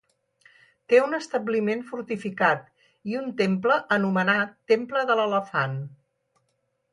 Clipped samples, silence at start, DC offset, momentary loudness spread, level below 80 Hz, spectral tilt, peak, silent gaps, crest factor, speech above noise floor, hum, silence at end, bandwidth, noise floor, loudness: under 0.1%; 0.9 s; under 0.1%; 10 LU; -74 dBFS; -6 dB/octave; -6 dBFS; none; 20 dB; 50 dB; none; 1 s; 11 kHz; -74 dBFS; -24 LUFS